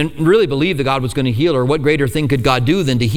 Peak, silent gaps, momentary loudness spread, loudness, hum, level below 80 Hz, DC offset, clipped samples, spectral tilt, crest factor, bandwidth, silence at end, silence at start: 0 dBFS; none; 4 LU; -15 LUFS; none; -36 dBFS; under 0.1%; under 0.1%; -6.5 dB/octave; 14 dB; 16.5 kHz; 0 s; 0 s